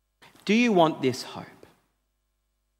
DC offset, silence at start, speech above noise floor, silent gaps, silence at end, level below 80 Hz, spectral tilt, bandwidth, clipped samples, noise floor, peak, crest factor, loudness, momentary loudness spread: under 0.1%; 0.45 s; 52 dB; none; 1.35 s; -74 dBFS; -5.5 dB/octave; 15.5 kHz; under 0.1%; -75 dBFS; -6 dBFS; 20 dB; -23 LUFS; 18 LU